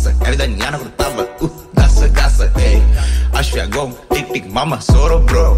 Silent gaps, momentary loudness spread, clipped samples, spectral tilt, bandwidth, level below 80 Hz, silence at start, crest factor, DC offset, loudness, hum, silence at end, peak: none; 8 LU; under 0.1%; -5.5 dB/octave; 14.5 kHz; -14 dBFS; 0 s; 10 dB; under 0.1%; -15 LUFS; none; 0 s; -2 dBFS